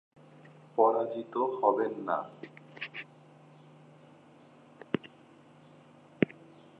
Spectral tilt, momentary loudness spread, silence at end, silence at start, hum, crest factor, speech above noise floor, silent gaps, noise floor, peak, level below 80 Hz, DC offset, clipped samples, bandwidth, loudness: -8 dB/octave; 23 LU; 0.55 s; 0.75 s; none; 26 dB; 28 dB; none; -57 dBFS; -8 dBFS; -78 dBFS; under 0.1%; under 0.1%; 5.8 kHz; -32 LUFS